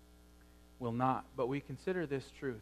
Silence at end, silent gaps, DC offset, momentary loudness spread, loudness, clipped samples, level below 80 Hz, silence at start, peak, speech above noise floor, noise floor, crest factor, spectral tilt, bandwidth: 0 s; none; under 0.1%; 7 LU; -38 LUFS; under 0.1%; -62 dBFS; 0 s; -18 dBFS; 23 dB; -61 dBFS; 20 dB; -7.5 dB/octave; 14 kHz